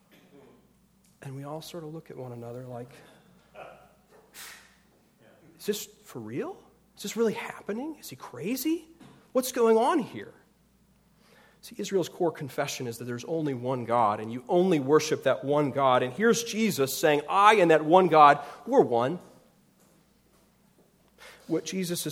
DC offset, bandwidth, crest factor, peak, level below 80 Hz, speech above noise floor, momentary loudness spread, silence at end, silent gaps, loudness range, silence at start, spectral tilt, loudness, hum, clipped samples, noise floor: under 0.1%; 17.5 kHz; 24 dB; -4 dBFS; -72 dBFS; 38 dB; 22 LU; 0 s; none; 21 LU; 1.2 s; -5 dB/octave; -26 LUFS; none; under 0.1%; -64 dBFS